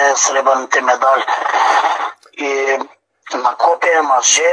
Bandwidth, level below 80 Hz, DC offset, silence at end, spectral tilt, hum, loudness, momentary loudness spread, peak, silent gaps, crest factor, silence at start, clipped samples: 10.5 kHz; -78 dBFS; under 0.1%; 0 s; 2 dB/octave; none; -14 LUFS; 9 LU; 0 dBFS; none; 14 dB; 0 s; under 0.1%